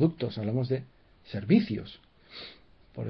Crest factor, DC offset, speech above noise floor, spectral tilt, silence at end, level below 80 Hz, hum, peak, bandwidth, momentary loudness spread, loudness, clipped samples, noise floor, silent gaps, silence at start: 20 dB; under 0.1%; 26 dB; -10 dB/octave; 0 s; -62 dBFS; none; -10 dBFS; 5.6 kHz; 22 LU; -29 LUFS; under 0.1%; -54 dBFS; none; 0 s